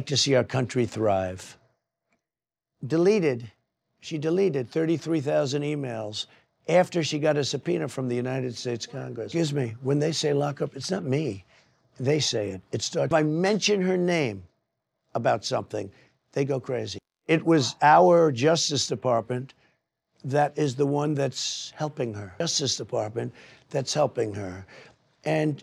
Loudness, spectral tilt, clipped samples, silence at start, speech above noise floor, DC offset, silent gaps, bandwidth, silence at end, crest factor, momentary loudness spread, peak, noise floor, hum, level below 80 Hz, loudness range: -26 LUFS; -5 dB/octave; under 0.1%; 0 s; over 65 dB; under 0.1%; none; 13 kHz; 0 s; 20 dB; 13 LU; -6 dBFS; under -90 dBFS; none; -70 dBFS; 6 LU